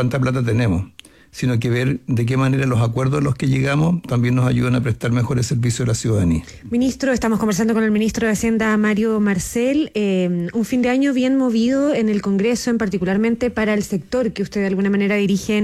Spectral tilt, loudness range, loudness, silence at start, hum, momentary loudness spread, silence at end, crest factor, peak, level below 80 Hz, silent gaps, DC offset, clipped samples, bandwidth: -6.5 dB/octave; 1 LU; -19 LUFS; 0 s; none; 4 LU; 0 s; 10 dB; -8 dBFS; -44 dBFS; none; under 0.1%; under 0.1%; 14.5 kHz